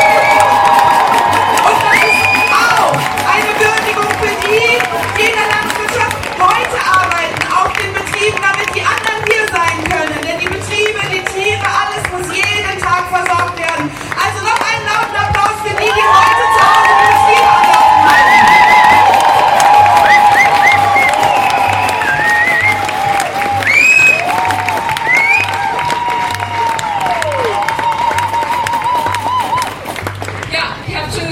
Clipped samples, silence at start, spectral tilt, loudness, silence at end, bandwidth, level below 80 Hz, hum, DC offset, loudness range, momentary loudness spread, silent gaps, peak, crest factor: under 0.1%; 0 s; -2.5 dB/octave; -10 LUFS; 0 s; 16.5 kHz; -40 dBFS; none; under 0.1%; 8 LU; 9 LU; none; 0 dBFS; 12 dB